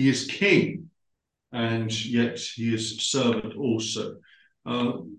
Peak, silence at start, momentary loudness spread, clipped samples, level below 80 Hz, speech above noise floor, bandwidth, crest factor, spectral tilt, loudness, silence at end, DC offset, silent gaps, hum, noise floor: -6 dBFS; 0 s; 11 LU; under 0.1%; -64 dBFS; 53 dB; 10 kHz; 20 dB; -4.5 dB/octave; -26 LUFS; 0 s; under 0.1%; none; none; -79 dBFS